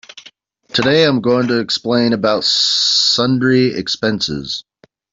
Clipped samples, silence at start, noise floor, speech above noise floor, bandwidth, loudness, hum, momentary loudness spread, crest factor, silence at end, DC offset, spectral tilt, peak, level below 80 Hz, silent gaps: under 0.1%; 0.15 s; -46 dBFS; 31 dB; 7.8 kHz; -14 LUFS; none; 8 LU; 14 dB; 0.5 s; under 0.1%; -4 dB/octave; -2 dBFS; -52 dBFS; none